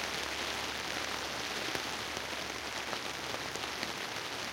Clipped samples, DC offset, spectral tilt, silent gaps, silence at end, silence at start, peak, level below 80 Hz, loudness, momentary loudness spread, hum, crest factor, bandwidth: under 0.1%; under 0.1%; -1.5 dB/octave; none; 0 s; 0 s; -16 dBFS; -60 dBFS; -36 LUFS; 2 LU; none; 22 dB; 17 kHz